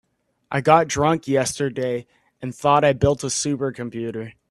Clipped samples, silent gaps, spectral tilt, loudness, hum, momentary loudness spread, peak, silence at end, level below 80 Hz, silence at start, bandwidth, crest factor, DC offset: under 0.1%; none; -5 dB/octave; -21 LUFS; none; 13 LU; 0 dBFS; 0.2 s; -48 dBFS; 0.5 s; 13 kHz; 20 dB; under 0.1%